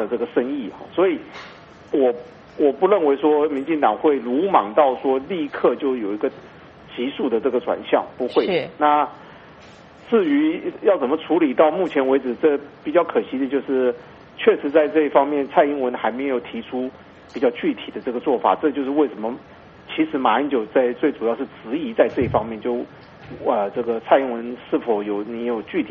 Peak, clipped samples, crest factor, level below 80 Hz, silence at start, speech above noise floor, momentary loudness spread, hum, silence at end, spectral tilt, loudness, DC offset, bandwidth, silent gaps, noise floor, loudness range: 0 dBFS; under 0.1%; 20 dB; -58 dBFS; 0 s; 24 dB; 11 LU; none; 0 s; -4 dB/octave; -21 LUFS; under 0.1%; 6 kHz; none; -44 dBFS; 4 LU